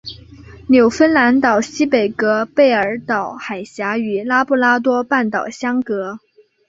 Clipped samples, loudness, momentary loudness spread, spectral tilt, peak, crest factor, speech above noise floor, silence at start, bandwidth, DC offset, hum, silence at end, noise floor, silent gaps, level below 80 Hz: under 0.1%; -16 LUFS; 13 LU; -5 dB/octave; -2 dBFS; 14 dB; 23 dB; 0.05 s; 7.8 kHz; under 0.1%; none; 0.5 s; -39 dBFS; none; -52 dBFS